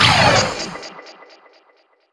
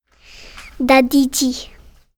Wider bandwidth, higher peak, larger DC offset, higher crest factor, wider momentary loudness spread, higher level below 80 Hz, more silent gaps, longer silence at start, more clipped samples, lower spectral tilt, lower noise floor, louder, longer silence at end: second, 11 kHz vs 20 kHz; about the same, 0 dBFS vs 0 dBFS; neither; about the same, 18 dB vs 18 dB; about the same, 24 LU vs 23 LU; about the same, -44 dBFS vs -44 dBFS; neither; second, 0 s vs 0.4 s; neither; about the same, -3 dB/octave vs -2.5 dB/octave; first, -57 dBFS vs -42 dBFS; about the same, -15 LUFS vs -15 LUFS; first, 1 s vs 0.5 s